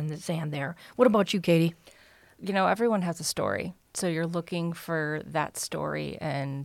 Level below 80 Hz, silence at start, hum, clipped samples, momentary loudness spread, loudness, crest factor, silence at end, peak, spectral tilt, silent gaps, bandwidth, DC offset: -64 dBFS; 0 s; none; under 0.1%; 9 LU; -28 LUFS; 20 dB; 0 s; -8 dBFS; -5 dB/octave; none; 16.5 kHz; under 0.1%